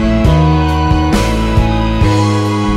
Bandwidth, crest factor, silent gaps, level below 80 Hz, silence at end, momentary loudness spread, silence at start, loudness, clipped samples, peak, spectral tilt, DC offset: 14 kHz; 10 dB; none; -16 dBFS; 0 s; 3 LU; 0 s; -12 LUFS; under 0.1%; 0 dBFS; -6.5 dB/octave; under 0.1%